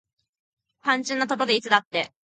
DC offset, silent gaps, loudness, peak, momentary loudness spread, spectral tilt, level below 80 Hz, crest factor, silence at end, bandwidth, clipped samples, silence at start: under 0.1%; 1.85-1.91 s; -23 LUFS; -2 dBFS; 8 LU; -2.5 dB/octave; -76 dBFS; 24 dB; 0.25 s; 9.4 kHz; under 0.1%; 0.85 s